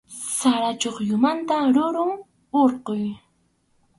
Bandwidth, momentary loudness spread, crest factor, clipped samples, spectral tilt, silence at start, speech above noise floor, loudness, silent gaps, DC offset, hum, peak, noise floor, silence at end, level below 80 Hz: 11.5 kHz; 8 LU; 16 dB; under 0.1%; -4 dB/octave; 0.1 s; 45 dB; -22 LUFS; none; under 0.1%; none; -6 dBFS; -66 dBFS; 0.8 s; -66 dBFS